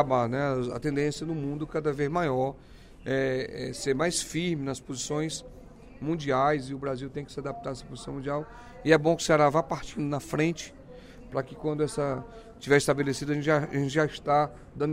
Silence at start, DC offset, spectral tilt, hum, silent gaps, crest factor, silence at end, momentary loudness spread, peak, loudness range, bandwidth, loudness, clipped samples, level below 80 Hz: 0 s; under 0.1%; -5 dB/octave; none; none; 22 dB; 0 s; 14 LU; -6 dBFS; 4 LU; 16 kHz; -29 LUFS; under 0.1%; -52 dBFS